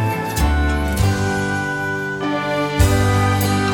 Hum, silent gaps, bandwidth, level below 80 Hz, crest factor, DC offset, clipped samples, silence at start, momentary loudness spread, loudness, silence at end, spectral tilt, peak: none; none; 19.5 kHz; -26 dBFS; 16 dB; under 0.1%; under 0.1%; 0 s; 6 LU; -19 LUFS; 0 s; -5.5 dB/octave; -2 dBFS